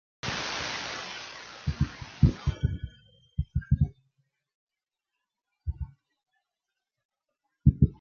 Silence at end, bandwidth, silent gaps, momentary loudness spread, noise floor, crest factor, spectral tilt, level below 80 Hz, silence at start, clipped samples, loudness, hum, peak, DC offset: 0.05 s; 7.2 kHz; 4.54-4.67 s, 7.05-7.09 s; 15 LU; -88 dBFS; 24 dB; -6 dB/octave; -38 dBFS; 0.25 s; under 0.1%; -30 LUFS; none; -6 dBFS; under 0.1%